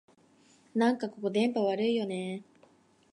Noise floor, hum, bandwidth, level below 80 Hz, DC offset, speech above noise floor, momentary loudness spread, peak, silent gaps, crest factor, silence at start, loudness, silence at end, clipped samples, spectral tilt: -63 dBFS; none; 11 kHz; -84 dBFS; under 0.1%; 34 dB; 9 LU; -14 dBFS; none; 18 dB; 0.75 s; -30 LUFS; 0.7 s; under 0.1%; -6 dB/octave